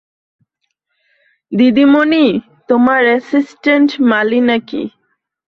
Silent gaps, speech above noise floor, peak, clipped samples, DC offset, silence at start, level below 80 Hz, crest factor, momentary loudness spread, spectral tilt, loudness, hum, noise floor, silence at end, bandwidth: none; 59 dB; -2 dBFS; under 0.1%; under 0.1%; 1.5 s; -58 dBFS; 12 dB; 12 LU; -6.5 dB/octave; -12 LUFS; none; -70 dBFS; 0.7 s; 6.4 kHz